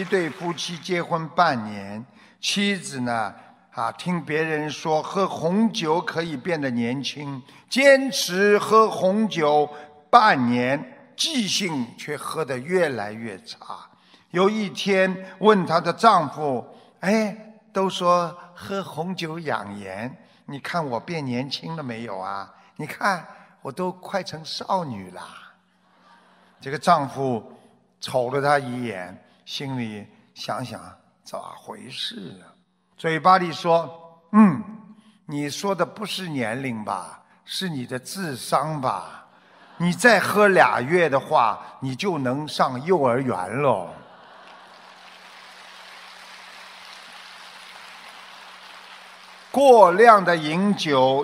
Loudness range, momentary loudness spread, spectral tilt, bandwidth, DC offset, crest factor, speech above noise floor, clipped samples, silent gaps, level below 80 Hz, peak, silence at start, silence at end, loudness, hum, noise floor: 12 LU; 23 LU; -5 dB/octave; 16 kHz; under 0.1%; 22 dB; 38 dB; under 0.1%; none; -70 dBFS; 0 dBFS; 0 s; 0 s; -22 LUFS; none; -60 dBFS